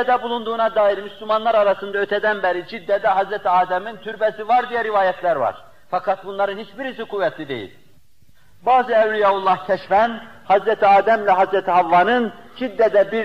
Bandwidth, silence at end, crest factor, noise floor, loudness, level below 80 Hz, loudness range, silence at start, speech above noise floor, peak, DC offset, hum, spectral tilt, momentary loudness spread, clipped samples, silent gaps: 8 kHz; 0 s; 14 dB; -57 dBFS; -19 LUFS; -60 dBFS; 6 LU; 0 s; 38 dB; -6 dBFS; 0.5%; none; -6 dB/octave; 12 LU; under 0.1%; none